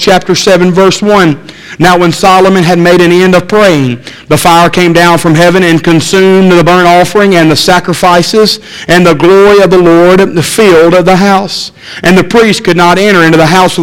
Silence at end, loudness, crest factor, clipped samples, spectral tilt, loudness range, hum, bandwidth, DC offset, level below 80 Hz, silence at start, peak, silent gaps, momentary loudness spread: 0 s; -5 LUFS; 4 dB; 7%; -5 dB/octave; 1 LU; none; 17 kHz; under 0.1%; -34 dBFS; 0 s; 0 dBFS; none; 6 LU